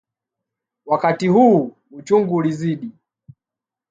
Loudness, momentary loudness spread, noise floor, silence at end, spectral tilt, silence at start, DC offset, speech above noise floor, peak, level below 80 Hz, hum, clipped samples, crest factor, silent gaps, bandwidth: -17 LUFS; 16 LU; -88 dBFS; 1 s; -8 dB/octave; 0.85 s; under 0.1%; 71 dB; -2 dBFS; -66 dBFS; none; under 0.1%; 18 dB; none; 9 kHz